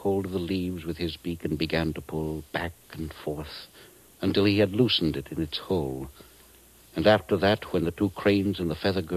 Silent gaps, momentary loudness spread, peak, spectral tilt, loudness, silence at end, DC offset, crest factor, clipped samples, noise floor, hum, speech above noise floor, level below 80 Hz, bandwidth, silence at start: none; 14 LU; -8 dBFS; -6.5 dB/octave; -27 LUFS; 0 s; under 0.1%; 20 dB; under 0.1%; -54 dBFS; none; 28 dB; -48 dBFS; 14 kHz; 0 s